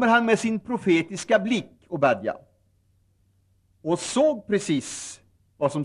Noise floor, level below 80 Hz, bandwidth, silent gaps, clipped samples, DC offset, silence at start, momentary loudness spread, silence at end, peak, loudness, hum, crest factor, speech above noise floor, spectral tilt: -65 dBFS; -66 dBFS; 12 kHz; none; under 0.1%; under 0.1%; 0 s; 13 LU; 0 s; -6 dBFS; -24 LUFS; none; 18 dB; 41 dB; -4.5 dB/octave